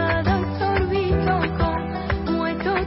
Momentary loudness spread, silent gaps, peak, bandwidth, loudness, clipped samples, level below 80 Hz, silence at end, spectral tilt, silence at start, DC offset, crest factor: 4 LU; none; -10 dBFS; 5.8 kHz; -22 LUFS; under 0.1%; -32 dBFS; 0 s; -10.5 dB/octave; 0 s; under 0.1%; 12 dB